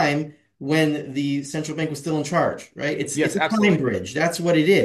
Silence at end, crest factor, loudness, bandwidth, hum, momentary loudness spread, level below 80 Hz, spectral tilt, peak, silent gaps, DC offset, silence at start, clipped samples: 0 s; 16 dB; -22 LUFS; 12.5 kHz; none; 8 LU; -62 dBFS; -5 dB/octave; -6 dBFS; none; under 0.1%; 0 s; under 0.1%